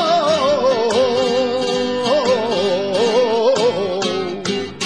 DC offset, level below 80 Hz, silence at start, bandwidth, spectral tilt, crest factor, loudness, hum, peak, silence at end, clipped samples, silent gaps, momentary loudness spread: 0.4%; -56 dBFS; 0 s; 11 kHz; -4 dB/octave; 12 dB; -17 LUFS; none; -4 dBFS; 0 s; under 0.1%; none; 5 LU